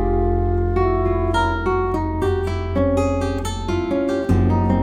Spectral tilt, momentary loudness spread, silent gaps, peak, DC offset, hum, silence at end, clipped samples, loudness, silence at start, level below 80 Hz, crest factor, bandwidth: -7.5 dB/octave; 5 LU; none; -4 dBFS; under 0.1%; none; 0 s; under 0.1%; -20 LUFS; 0 s; -28 dBFS; 14 dB; 10 kHz